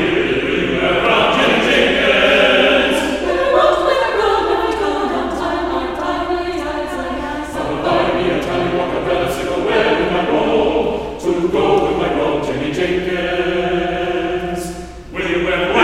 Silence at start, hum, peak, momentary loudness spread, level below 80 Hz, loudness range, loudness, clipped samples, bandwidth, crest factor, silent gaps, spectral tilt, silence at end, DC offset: 0 s; none; 0 dBFS; 9 LU; -36 dBFS; 6 LU; -16 LUFS; under 0.1%; 15 kHz; 16 dB; none; -5 dB/octave; 0 s; under 0.1%